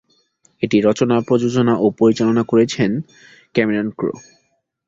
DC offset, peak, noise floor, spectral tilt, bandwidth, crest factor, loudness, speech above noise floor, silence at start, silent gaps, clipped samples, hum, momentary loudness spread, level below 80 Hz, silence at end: under 0.1%; -2 dBFS; -66 dBFS; -6.5 dB/octave; 7.8 kHz; 16 dB; -17 LUFS; 50 dB; 0.6 s; none; under 0.1%; none; 10 LU; -56 dBFS; 0.7 s